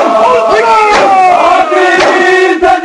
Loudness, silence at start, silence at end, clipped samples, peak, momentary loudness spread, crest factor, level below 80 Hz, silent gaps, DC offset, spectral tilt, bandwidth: -6 LUFS; 0 s; 0 s; under 0.1%; 0 dBFS; 2 LU; 6 dB; -40 dBFS; none; under 0.1%; -3 dB/octave; 11 kHz